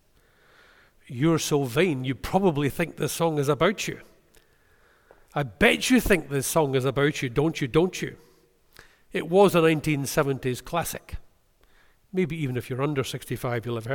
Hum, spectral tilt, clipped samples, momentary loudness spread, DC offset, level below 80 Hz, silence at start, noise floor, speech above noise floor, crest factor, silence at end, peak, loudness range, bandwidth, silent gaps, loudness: none; -5 dB/octave; under 0.1%; 12 LU; under 0.1%; -46 dBFS; 1.1 s; -60 dBFS; 36 dB; 20 dB; 0 s; -6 dBFS; 6 LU; 19 kHz; none; -25 LUFS